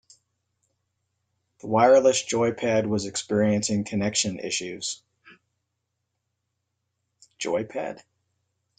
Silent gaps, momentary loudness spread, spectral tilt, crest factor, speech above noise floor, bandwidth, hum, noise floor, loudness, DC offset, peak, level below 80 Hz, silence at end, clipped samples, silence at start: none; 16 LU; -4 dB/octave; 22 dB; 56 dB; 9.6 kHz; none; -80 dBFS; -24 LUFS; under 0.1%; -4 dBFS; -66 dBFS; 0.8 s; under 0.1%; 1.65 s